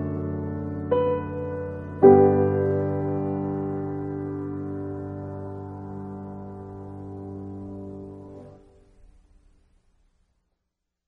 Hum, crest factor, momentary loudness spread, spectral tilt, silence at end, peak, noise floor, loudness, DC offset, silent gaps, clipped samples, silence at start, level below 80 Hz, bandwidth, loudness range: none; 24 dB; 21 LU; -11.5 dB/octave; 2.05 s; -2 dBFS; -81 dBFS; -24 LUFS; under 0.1%; none; under 0.1%; 0 s; -56 dBFS; 3.2 kHz; 20 LU